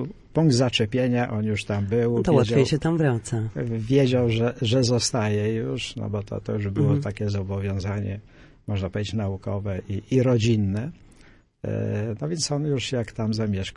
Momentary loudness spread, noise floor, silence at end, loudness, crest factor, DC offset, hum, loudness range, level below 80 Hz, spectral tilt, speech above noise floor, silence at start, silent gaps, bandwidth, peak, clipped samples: 10 LU; -53 dBFS; 0 s; -24 LUFS; 18 dB; under 0.1%; none; 5 LU; -50 dBFS; -6 dB/octave; 30 dB; 0 s; none; 11 kHz; -6 dBFS; under 0.1%